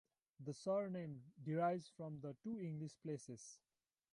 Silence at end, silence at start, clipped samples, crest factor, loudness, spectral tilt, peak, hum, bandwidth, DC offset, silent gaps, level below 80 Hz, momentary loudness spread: 0.55 s; 0.4 s; under 0.1%; 18 dB; -46 LUFS; -7 dB/octave; -28 dBFS; none; 11.5 kHz; under 0.1%; none; -86 dBFS; 14 LU